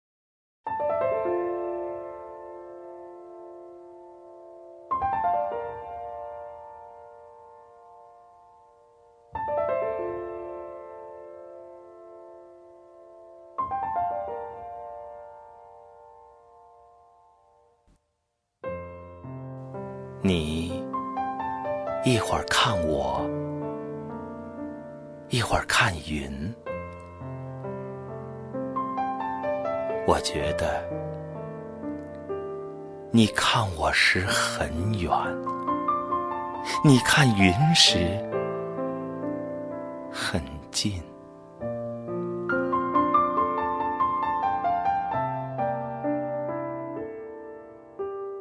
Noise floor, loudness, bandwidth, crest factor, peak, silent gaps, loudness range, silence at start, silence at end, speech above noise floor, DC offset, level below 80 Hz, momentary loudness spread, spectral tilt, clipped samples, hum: -78 dBFS; -27 LUFS; 11 kHz; 24 dB; -4 dBFS; none; 17 LU; 0.65 s; 0 s; 55 dB; under 0.1%; -50 dBFS; 22 LU; -4.5 dB/octave; under 0.1%; none